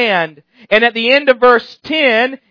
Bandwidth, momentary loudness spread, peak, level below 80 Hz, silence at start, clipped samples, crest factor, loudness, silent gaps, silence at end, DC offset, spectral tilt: 5.4 kHz; 7 LU; 0 dBFS; -54 dBFS; 0 s; 0.2%; 14 dB; -12 LUFS; none; 0.15 s; under 0.1%; -5 dB/octave